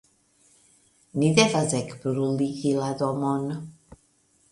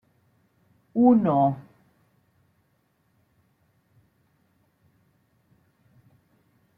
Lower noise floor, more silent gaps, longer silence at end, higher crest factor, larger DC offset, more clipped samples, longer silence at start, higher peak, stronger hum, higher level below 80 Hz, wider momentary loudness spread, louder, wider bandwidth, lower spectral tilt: second, -64 dBFS vs -69 dBFS; neither; second, 0.8 s vs 5.15 s; about the same, 22 dB vs 22 dB; neither; neither; first, 1.15 s vs 0.95 s; about the same, -4 dBFS vs -6 dBFS; neither; first, -62 dBFS vs -72 dBFS; about the same, 14 LU vs 14 LU; second, -25 LUFS vs -22 LUFS; first, 11.5 kHz vs 3.5 kHz; second, -5 dB/octave vs -11.5 dB/octave